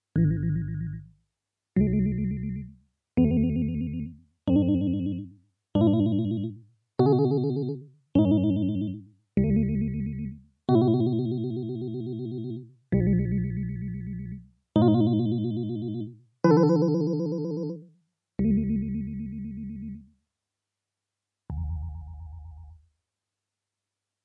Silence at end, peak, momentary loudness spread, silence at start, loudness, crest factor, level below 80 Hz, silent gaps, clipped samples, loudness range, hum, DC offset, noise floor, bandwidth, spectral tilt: 1.5 s; -8 dBFS; 17 LU; 0.15 s; -27 LUFS; 18 dB; -46 dBFS; none; under 0.1%; 13 LU; none; under 0.1%; -87 dBFS; 6 kHz; -10.5 dB/octave